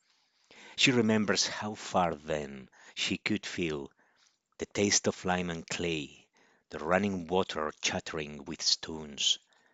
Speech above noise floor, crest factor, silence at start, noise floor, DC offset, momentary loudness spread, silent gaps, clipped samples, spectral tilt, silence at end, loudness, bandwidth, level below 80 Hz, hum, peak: 40 dB; 22 dB; 0.5 s; -71 dBFS; under 0.1%; 14 LU; none; under 0.1%; -3 dB/octave; 0.35 s; -31 LUFS; 9 kHz; -66 dBFS; none; -10 dBFS